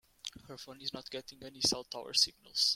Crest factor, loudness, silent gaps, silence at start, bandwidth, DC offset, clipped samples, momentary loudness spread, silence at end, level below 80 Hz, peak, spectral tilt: 24 dB; -33 LUFS; none; 0.25 s; 16.5 kHz; under 0.1%; under 0.1%; 19 LU; 0 s; -68 dBFS; -14 dBFS; -1 dB/octave